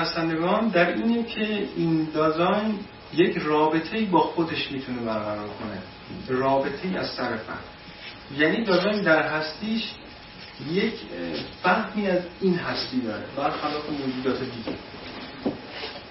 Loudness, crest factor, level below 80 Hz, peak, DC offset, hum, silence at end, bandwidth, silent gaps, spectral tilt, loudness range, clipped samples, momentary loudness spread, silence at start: -25 LUFS; 20 dB; -56 dBFS; -6 dBFS; under 0.1%; none; 0 s; 6 kHz; none; -9 dB/octave; 5 LU; under 0.1%; 15 LU; 0 s